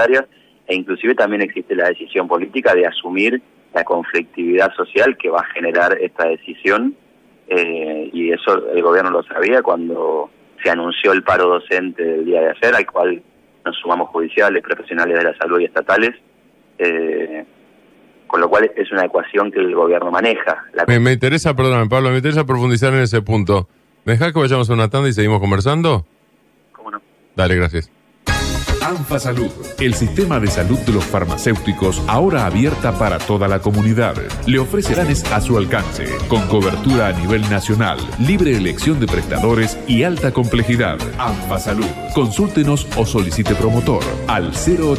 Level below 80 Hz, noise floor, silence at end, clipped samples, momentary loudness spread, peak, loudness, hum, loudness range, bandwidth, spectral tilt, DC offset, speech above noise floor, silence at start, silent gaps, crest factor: -32 dBFS; -55 dBFS; 0 s; under 0.1%; 7 LU; -2 dBFS; -16 LUFS; none; 3 LU; 15.5 kHz; -6 dB/octave; under 0.1%; 39 dB; 0 s; none; 14 dB